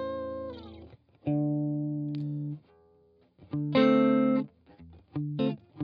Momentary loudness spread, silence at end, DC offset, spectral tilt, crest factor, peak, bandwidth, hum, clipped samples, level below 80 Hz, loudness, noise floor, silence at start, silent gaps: 18 LU; 0 s; under 0.1%; -9.5 dB/octave; 18 dB; -12 dBFS; 5.2 kHz; none; under 0.1%; -64 dBFS; -29 LUFS; -63 dBFS; 0 s; none